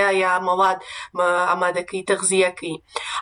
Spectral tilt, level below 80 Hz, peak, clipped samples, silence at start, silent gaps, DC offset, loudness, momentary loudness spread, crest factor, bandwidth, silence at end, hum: -2.5 dB/octave; -64 dBFS; -6 dBFS; under 0.1%; 0 s; none; under 0.1%; -21 LUFS; 11 LU; 14 dB; 11 kHz; 0 s; none